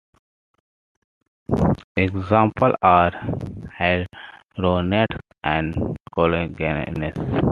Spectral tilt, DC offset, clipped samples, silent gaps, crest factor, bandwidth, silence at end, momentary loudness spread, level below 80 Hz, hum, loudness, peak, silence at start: -8.5 dB/octave; under 0.1%; under 0.1%; 1.84-1.95 s, 6.00-6.04 s; 20 dB; 7.2 kHz; 0 s; 12 LU; -42 dBFS; none; -21 LUFS; -2 dBFS; 1.5 s